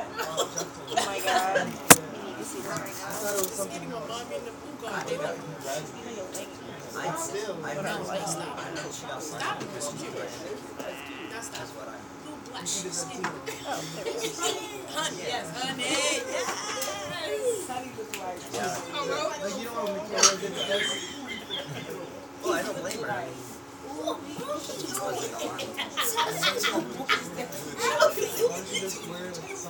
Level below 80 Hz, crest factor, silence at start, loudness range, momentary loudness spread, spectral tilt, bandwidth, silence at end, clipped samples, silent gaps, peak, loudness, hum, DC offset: -66 dBFS; 30 dB; 0 s; 10 LU; 13 LU; -2 dB/octave; over 20 kHz; 0 s; under 0.1%; none; 0 dBFS; -29 LUFS; none; under 0.1%